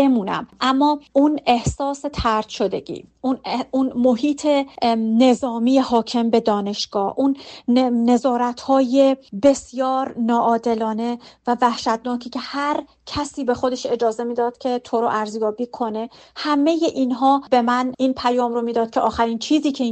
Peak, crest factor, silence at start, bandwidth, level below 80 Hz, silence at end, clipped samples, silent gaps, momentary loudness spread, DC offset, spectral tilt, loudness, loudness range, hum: -4 dBFS; 14 dB; 0 s; 8.8 kHz; -48 dBFS; 0 s; under 0.1%; none; 8 LU; under 0.1%; -5 dB/octave; -20 LUFS; 4 LU; none